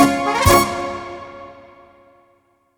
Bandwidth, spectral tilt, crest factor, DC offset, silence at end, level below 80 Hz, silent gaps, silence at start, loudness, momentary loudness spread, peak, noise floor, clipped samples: 19.5 kHz; -4.5 dB/octave; 20 dB; under 0.1%; 1.25 s; -36 dBFS; none; 0 s; -16 LUFS; 24 LU; 0 dBFS; -60 dBFS; under 0.1%